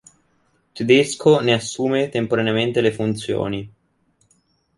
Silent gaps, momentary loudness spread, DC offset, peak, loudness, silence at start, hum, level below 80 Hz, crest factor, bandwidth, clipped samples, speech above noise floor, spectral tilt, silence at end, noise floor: none; 8 LU; under 0.1%; -2 dBFS; -19 LUFS; 0.75 s; none; -56 dBFS; 18 dB; 11.5 kHz; under 0.1%; 45 dB; -5 dB/octave; 1.1 s; -64 dBFS